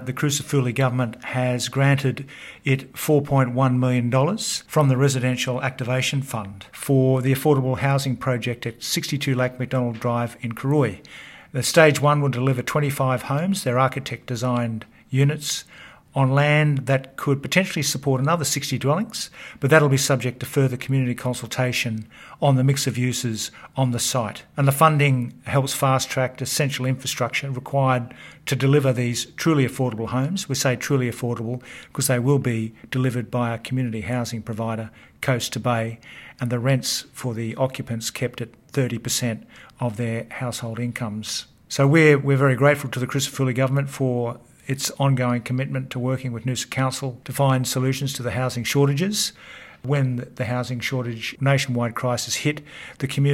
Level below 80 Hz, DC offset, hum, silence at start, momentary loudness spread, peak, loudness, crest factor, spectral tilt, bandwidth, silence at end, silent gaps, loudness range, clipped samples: -58 dBFS; under 0.1%; none; 0 s; 10 LU; 0 dBFS; -22 LUFS; 22 dB; -5 dB/octave; 16.5 kHz; 0 s; none; 5 LU; under 0.1%